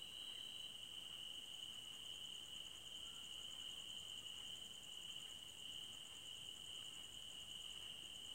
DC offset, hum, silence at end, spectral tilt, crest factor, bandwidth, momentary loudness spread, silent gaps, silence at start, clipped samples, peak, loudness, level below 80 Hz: under 0.1%; none; 0 s; 0 dB/octave; 14 dB; 16 kHz; 2 LU; none; 0 s; under 0.1%; -40 dBFS; -51 LUFS; -78 dBFS